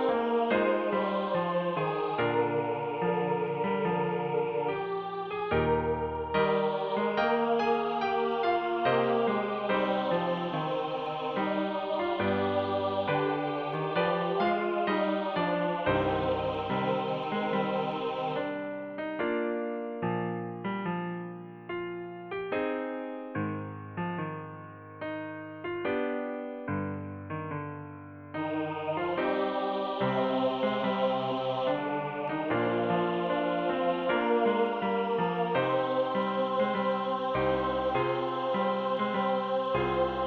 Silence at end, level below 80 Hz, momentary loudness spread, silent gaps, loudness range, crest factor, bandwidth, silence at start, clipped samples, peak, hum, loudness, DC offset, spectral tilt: 0 s; -58 dBFS; 9 LU; none; 7 LU; 16 dB; 6.2 kHz; 0 s; under 0.1%; -14 dBFS; none; -30 LUFS; under 0.1%; -8 dB/octave